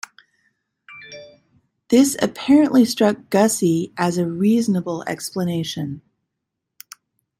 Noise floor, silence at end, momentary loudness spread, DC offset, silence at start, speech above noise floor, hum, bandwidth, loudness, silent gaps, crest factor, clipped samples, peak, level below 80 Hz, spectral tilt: -80 dBFS; 1.4 s; 22 LU; under 0.1%; 0.9 s; 62 dB; none; 16 kHz; -19 LUFS; none; 18 dB; under 0.1%; -4 dBFS; -62 dBFS; -5 dB/octave